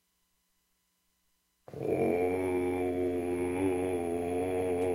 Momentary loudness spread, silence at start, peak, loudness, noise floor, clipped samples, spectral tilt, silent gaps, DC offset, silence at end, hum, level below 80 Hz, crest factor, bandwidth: 3 LU; 1.7 s; -18 dBFS; -32 LUFS; -76 dBFS; under 0.1%; -7 dB/octave; none; under 0.1%; 0 s; none; -62 dBFS; 14 dB; 16 kHz